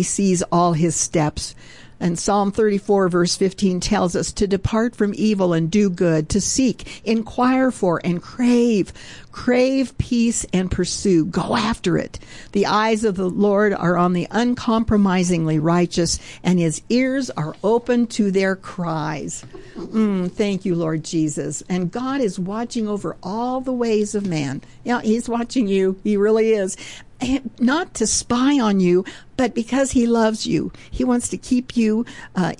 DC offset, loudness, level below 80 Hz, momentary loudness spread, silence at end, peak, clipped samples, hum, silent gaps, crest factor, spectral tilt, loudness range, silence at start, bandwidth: 0.4%; -20 LUFS; -42 dBFS; 8 LU; 0.05 s; -8 dBFS; under 0.1%; none; none; 12 dB; -5 dB/octave; 4 LU; 0 s; 11.5 kHz